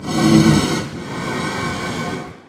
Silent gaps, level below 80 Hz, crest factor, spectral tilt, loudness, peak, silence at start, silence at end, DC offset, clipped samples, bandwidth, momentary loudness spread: none; -40 dBFS; 18 dB; -5 dB/octave; -18 LUFS; 0 dBFS; 0 s; 0.1 s; under 0.1%; under 0.1%; 16 kHz; 14 LU